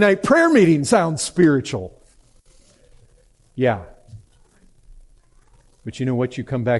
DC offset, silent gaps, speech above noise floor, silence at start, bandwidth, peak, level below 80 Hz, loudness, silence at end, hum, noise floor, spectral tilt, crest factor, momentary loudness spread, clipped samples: under 0.1%; none; 37 dB; 0 s; 11.5 kHz; -2 dBFS; -52 dBFS; -18 LUFS; 0 s; none; -55 dBFS; -5.5 dB/octave; 18 dB; 20 LU; under 0.1%